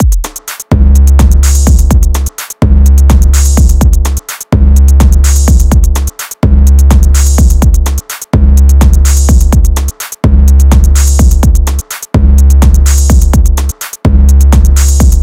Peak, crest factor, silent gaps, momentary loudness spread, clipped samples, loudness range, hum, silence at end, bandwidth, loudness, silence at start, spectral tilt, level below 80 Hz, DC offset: 0 dBFS; 4 dB; none; 8 LU; 7%; 1 LU; none; 0 s; 16 kHz; -8 LUFS; 0 s; -5.5 dB/octave; -6 dBFS; 0.9%